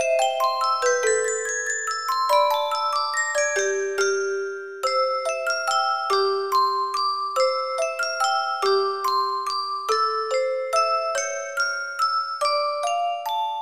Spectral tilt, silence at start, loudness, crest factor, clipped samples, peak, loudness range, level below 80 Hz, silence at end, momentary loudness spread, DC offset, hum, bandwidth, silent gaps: 1.5 dB/octave; 0 s; -23 LUFS; 16 dB; under 0.1%; -8 dBFS; 1 LU; -78 dBFS; 0 s; 4 LU; 0.2%; none; 15.5 kHz; none